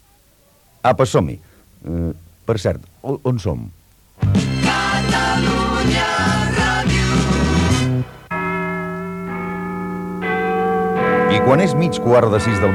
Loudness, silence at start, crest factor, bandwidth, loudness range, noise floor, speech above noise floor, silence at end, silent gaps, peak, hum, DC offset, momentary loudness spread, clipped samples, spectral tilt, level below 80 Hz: -18 LUFS; 0.85 s; 16 dB; 16.5 kHz; 5 LU; -53 dBFS; 37 dB; 0 s; none; -2 dBFS; none; under 0.1%; 11 LU; under 0.1%; -5.5 dB/octave; -32 dBFS